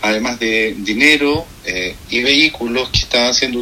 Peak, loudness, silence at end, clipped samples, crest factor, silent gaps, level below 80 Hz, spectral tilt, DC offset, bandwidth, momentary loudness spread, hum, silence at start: 0 dBFS; -14 LUFS; 0 s; under 0.1%; 16 dB; none; -36 dBFS; -3 dB/octave; under 0.1%; 16.5 kHz; 10 LU; none; 0 s